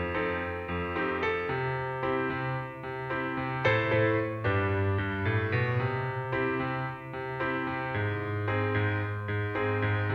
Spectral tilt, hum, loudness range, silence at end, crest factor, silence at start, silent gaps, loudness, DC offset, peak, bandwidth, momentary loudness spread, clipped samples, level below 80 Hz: -8.5 dB/octave; none; 3 LU; 0 s; 16 dB; 0 s; none; -30 LUFS; under 0.1%; -14 dBFS; 6.2 kHz; 7 LU; under 0.1%; -54 dBFS